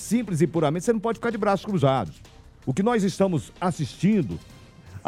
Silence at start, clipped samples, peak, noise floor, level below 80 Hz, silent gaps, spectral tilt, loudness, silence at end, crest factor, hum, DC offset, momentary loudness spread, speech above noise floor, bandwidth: 0 s; under 0.1%; -6 dBFS; -44 dBFS; -52 dBFS; none; -6.5 dB/octave; -24 LUFS; 0.1 s; 18 dB; none; under 0.1%; 9 LU; 21 dB; 14.5 kHz